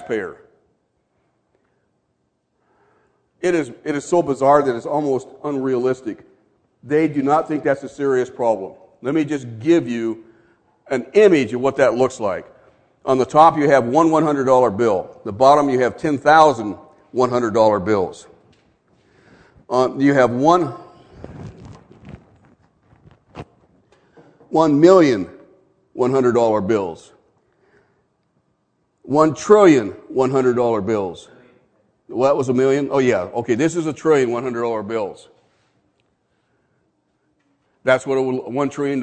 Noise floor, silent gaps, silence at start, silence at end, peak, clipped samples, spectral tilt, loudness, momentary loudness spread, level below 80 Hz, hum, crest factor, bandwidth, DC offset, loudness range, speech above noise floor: -69 dBFS; none; 0 s; 0 s; 0 dBFS; under 0.1%; -6.5 dB/octave; -17 LUFS; 17 LU; -58 dBFS; none; 20 dB; 9.2 kHz; under 0.1%; 8 LU; 52 dB